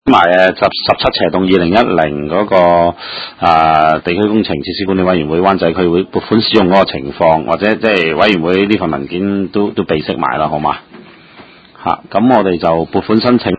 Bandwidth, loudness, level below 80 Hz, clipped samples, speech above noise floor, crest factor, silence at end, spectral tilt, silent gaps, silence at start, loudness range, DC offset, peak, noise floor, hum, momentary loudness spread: 8 kHz; -12 LUFS; -38 dBFS; 0.3%; 27 dB; 12 dB; 0 s; -7.5 dB/octave; none; 0.05 s; 4 LU; under 0.1%; 0 dBFS; -39 dBFS; none; 7 LU